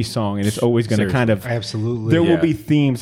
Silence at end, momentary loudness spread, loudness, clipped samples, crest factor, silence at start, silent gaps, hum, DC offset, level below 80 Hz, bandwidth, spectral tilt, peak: 0 s; 7 LU; -18 LUFS; under 0.1%; 16 dB; 0 s; none; none; under 0.1%; -48 dBFS; 16 kHz; -6.5 dB/octave; -2 dBFS